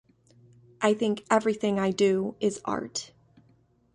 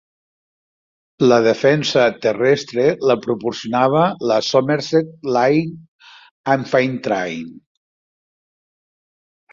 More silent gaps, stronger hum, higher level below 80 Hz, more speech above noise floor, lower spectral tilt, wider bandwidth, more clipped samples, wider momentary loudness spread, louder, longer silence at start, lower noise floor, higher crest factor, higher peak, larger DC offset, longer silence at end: second, none vs 5.88-5.99 s, 6.31-6.44 s; neither; second, -66 dBFS vs -60 dBFS; second, 37 dB vs over 73 dB; about the same, -5 dB/octave vs -5.5 dB/octave; first, 11 kHz vs 7.6 kHz; neither; about the same, 10 LU vs 8 LU; second, -27 LUFS vs -17 LUFS; second, 0.8 s vs 1.2 s; second, -63 dBFS vs under -90 dBFS; about the same, 20 dB vs 18 dB; second, -8 dBFS vs -2 dBFS; neither; second, 0.9 s vs 1.95 s